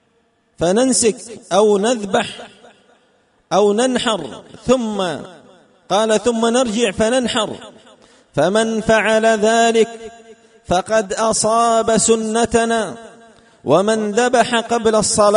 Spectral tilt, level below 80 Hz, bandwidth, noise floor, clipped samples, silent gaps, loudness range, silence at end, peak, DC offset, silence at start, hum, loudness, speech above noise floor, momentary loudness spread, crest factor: -3.5 dB/octave; -48 dBFS; 11 kHz; -60 dBFS; under 0.1%; none; 3 LU; 0 s; -2 dBFS; under 0.1%; 0.6 s; none; -16 LUFS; 45 dB; 12 LU; 16 dB